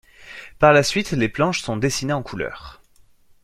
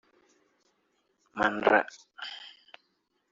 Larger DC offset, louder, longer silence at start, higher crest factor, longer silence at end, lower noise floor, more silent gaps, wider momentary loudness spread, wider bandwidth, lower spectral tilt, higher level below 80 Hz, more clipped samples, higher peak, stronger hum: neither; first, -20 LUFS vs -27 LUFS; second, 0.2 s vs 1.35 s; second, 20 dB vs 26 dB; about the same, 0.7 s vs 0.8 s; second, -53 dBFS vs -76 dBFS; neither; first, 24 LU vs 21 LU; first, 14.5 kHz vs 7.6 kHz; first, -4.5 dB/octave vs -1.5 dB/octave; first, -46 dBFS vs -70 dBFS; neither; first, -2 dBFS vs -6 dBFS; neither